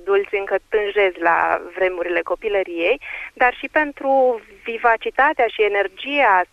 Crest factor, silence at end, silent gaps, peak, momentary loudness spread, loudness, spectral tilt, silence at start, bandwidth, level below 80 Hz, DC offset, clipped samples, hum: 18 dB; 0.05 s; none; -2 dBFS; 5 LU; -19 LUFS; -4.5 dB/octave; 0 s; 7.8 kHz; -52 dBFS; under 0.1%; under 0.1%; none